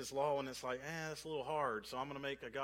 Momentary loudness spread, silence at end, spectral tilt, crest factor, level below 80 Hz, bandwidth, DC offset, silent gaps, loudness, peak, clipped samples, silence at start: 6 LU; 0 s; -4 dB/octave; 18 dB; -70 dBFS; 16.5 kHz; under 0.1%; none; -42 LUFS; -24 dBFS; under 0.1%; 0 s